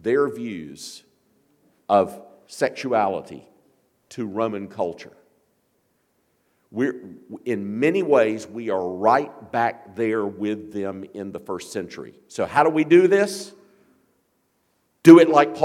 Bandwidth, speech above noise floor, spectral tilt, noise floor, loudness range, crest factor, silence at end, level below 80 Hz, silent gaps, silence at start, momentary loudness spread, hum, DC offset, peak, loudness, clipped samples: 13 kHz; 48 dB; -6 dB/octave; -68 dBFS; 9 LU; 22 dB; 0 s; -68 dBFS; none; 0.05 s; 21 LU; none; under 0.1%; 0 dBFS; -20 LUFS; under 0.1%